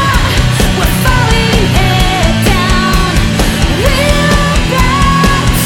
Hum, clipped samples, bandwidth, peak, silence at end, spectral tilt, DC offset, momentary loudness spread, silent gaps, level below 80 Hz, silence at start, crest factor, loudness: none; 0.3%; 18.5 kHz; 0 dBFS; 0 s; -4.5 dB/octave; under 0.1%; 2 LU; none; -14 dBFS; 0 s; 8 dB; -10 LUFS